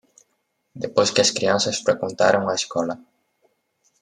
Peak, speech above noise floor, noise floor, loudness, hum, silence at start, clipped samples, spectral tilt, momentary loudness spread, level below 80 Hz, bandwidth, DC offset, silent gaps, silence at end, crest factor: -2 dBFS; 51 dB; -72 dBFS; -20 LUFS; none; 0.75 s; under 0.1%; -3 dB/octave; 10 LU; -68 dBFS; 11.5 kHz; under 0.1%; none; 1.05 s; 20 dB